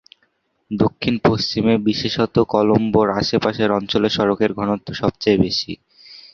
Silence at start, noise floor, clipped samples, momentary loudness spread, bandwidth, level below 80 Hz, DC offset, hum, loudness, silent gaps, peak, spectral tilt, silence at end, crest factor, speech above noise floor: 0.7 s; -65 dBFS; under 0.1%; 6 LU; 7 kHz; -46 dBFS; under 0.1%; none; -18 LUFS; none; 0 dBFS; -6.5 dB/octave; 0.15 s; 18 dB; 48 dB